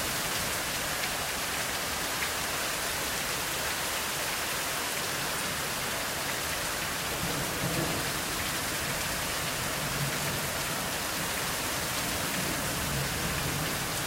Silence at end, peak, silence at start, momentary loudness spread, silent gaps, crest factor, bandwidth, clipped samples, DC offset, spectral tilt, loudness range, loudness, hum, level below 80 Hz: 0 s; -16 dBFS; 0 s; 1 LU; none; 16 dB; 16 kHz; under 0.1%; under 0.1%; -2 dB/octave; 0 LU; -30 LUFS; none; -48 dBFS